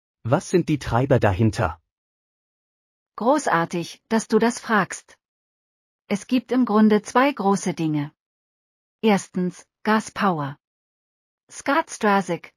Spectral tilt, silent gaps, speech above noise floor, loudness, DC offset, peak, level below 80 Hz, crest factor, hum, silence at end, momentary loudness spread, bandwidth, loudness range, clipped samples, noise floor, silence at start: -6 dB/octave; 1.91-3.06 s, 5.25-5.99 s, 8.20-8.99 s, 10.67-11.47 s; over 69 dB; -22 LUFS; under 0.1%; -4 dBFS; -50 dBFS; 18 dB; none; 0.1 s; 11 LU; 15 kHz; 3 LU; under 0.1%; under -90 dBFS; 0.25 s